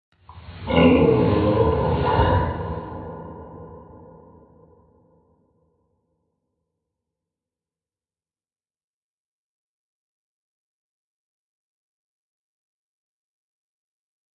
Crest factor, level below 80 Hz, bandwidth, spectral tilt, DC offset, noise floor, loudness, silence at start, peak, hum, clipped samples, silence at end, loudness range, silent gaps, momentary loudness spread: 24 dB; -42 dBFS; 4.8 kHz; -11.5 dB/octave; under 0.1%; under -90 dBFS; -19 LUFS; 0.3 s; -4 dBFS; none; under 0.1%; 10.4 s; 22 LU; none; 24 LU